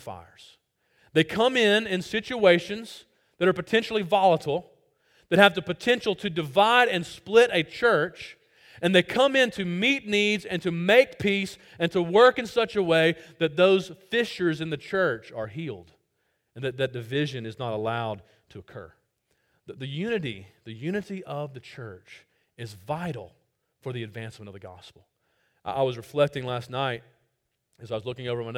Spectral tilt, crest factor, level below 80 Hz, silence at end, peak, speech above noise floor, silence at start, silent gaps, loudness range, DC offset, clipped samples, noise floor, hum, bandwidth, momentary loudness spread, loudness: -5 dB/octave; 26 dB; -64 dBFS; 0 s; 0 dBFS; 51 dB; 0.05 s; none; 13 LU; under 0.1%; under 0.1%; -76 dBFS; none; 16 kHz; 21 LU; -24 LUFS